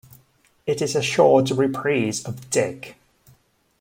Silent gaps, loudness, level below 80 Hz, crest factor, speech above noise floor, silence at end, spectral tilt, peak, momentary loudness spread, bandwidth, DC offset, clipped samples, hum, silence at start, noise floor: none; -21 LUFS; -62 dBFS; 20 dB; 39 dB; 0.9 s; -4.5 dB/octave; -4 dBFS; 15 LU; 16.5 kHz; under 0.1%; under 0.1%; none; 0.65 s; -60 dBFS